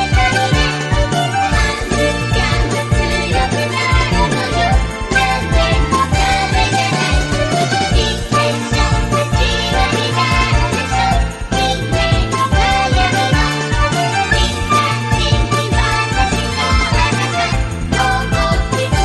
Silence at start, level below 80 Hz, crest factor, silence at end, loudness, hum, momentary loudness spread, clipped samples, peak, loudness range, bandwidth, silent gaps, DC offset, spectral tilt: 0 s; -20 dBFS; 12 dB; 0 s; -15 LUFS; none; 3 LU; under 0.1%; -2 dBFS; 1 LU; 12 kHz; none; under 0.1%; -4.5 dB/octave